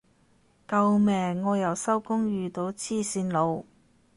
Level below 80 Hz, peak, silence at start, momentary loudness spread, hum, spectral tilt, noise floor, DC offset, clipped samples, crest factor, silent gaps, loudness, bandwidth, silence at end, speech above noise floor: -64 dBFS; -12 dBFS; 0.7 s; 8 LU; none; -6 dB/octave; -63 dBFS; under 0.1%; under 0.1%; 16 dB; none; -27 LUFS; 11.5 kHz; 0.55 s; 37 dB